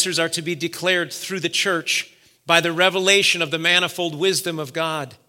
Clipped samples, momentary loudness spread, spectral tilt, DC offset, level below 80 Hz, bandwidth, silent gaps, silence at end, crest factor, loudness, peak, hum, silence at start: under 0.1%; 10 LU; -2.5 dB/octave; under 0.1%; -74 dBFS; 17 kHz; none; 0.15 s; 22 dB; -19 LUFS; 0 dBFS; none; 0 s